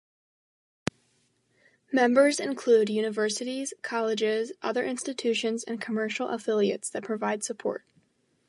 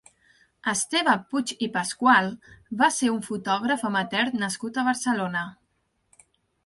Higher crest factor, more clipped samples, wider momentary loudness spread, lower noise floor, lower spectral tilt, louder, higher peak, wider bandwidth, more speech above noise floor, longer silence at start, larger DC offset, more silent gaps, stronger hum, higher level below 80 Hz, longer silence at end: about the same, 22 dB vs 20 dB; neither; about the same, 11 LU vs 11 LU; about the same, -70 dBFS vs -72 dBFS; about the same, -3.5 dB/octave vs -3 dB/octave; second, -28 LUFS vs -24 LUFS; about the same, -6 dBFS vs -6 dBFS; about the same, 11.5 kHz vs 11.5 kHz; second, 43 dB vs 47 dB; first, 1.9 s vs 0.65 s; neither; neither; neither; about the same, -72 dBFS vs -68 dBFS; second, 0.7 s vs 1.15 s